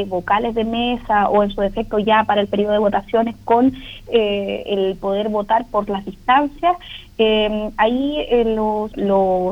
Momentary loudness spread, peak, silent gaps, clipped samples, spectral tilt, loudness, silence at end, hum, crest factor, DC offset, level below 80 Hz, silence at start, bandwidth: 6 LU; -2 dBFS; none; under 0.1%; -7 dB/octave; -18 LUFS; 0 s; none; 16 dB; under 0.1%; -40 dBFS; 0 s; 9 kHz